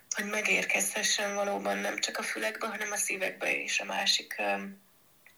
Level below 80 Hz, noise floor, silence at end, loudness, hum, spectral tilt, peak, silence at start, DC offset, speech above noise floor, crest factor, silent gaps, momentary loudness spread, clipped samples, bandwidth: under -90 dBFS; -61 dBFS; 0.6 s; -29 LUFS; none; -1 dB/octave; -14 dBFS; 0.1 s; under 0.1%; 30 dB; 18 dB; none; 6 LU; under 0.1%; over 20 kHz